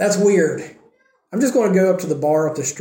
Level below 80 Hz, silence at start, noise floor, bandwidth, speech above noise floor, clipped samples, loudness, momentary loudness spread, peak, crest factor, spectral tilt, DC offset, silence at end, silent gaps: -68 dBFS; 0 s; -57 dBFS; 17 kHz; 40 dB; under 0.1%; -18 LUFS; 12 LU; -4 dBFS; 14 dB; -5.5 dB/octave; under 0.1%; 0 s; none